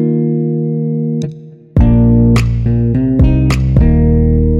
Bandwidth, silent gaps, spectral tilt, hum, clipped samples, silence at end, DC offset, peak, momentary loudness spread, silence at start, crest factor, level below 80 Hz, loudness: 10.5 kHz; none; -9 dB/octave; none; under 0.1%; 0 s; under 0.1%; 0 dBFS; 8 LU; 0 s; 10 dB; -16 dBFS; -12 LUFS